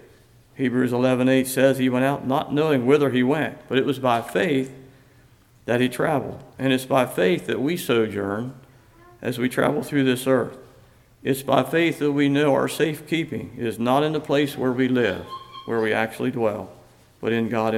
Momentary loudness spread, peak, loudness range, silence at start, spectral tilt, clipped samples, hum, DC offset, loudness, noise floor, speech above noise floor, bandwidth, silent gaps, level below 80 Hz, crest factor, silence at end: 11 LU; -4 dBFS; 4 LU; 0.6 s; -6 dB/octave; under 0.1%; none; under 0.1%; -22 LUFS; -54 dBFS; 32 dB; 16 kHz; none; -60 dBFS; 18 dB; 0 s